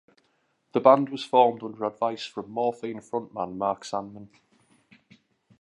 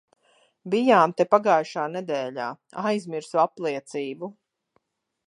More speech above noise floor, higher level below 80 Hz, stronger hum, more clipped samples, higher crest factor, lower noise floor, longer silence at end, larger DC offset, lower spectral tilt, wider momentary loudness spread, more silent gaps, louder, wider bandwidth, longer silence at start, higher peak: about the same, 45 dB vs 48 dB; first, -72 dBFS vs -80 dBFS; neither; neither; about the same, 24 dB vs 22 dB; about the same, -71 dBFS vs -71 dBFS; first, 1.35 s vs 0.95 s; neither; about the same, -6 dB/octave vs -5.5 dB/octave; about the same, 15 LU vs 14 LU; neither; about the same, -26 LUFS vs -24 LUFS; about the same, 11 kHz vs 11.5 kHz; about the same, 0.75 s vs 0.65 s; about the same, -2 dBFS vs -4 dBFS